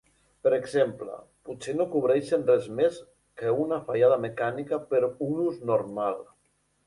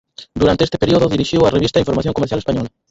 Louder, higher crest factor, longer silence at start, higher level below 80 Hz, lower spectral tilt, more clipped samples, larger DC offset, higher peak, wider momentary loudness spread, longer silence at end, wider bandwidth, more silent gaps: second, -27 LUFS vs -16 LUFS; about the same, 18 dB vs 14 dB; first, 0.45 s vs 0.2 s; second, -68 dBFS vs -36 dBFS; about the same, -6.5 dB/octave vs -6.5 dB/octave; neither; neither; second, -10 dBFS vs 0 dBFS; first, 15 LU vs 7 LU; first, 0.65 s vs 0.2 s; first, 11.5 kHz vs 8 kHz; neither